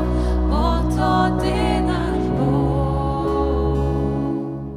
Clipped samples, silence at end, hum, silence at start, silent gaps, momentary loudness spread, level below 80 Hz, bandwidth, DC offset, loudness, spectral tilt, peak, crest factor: under 0.1%; 0 s; none; 0 s; none; 3 LU; -24 dBFS; 11 kHz; under 0.1%; -20 LUFS; -7.5 dB/octave; -4 dBFS; 14 dB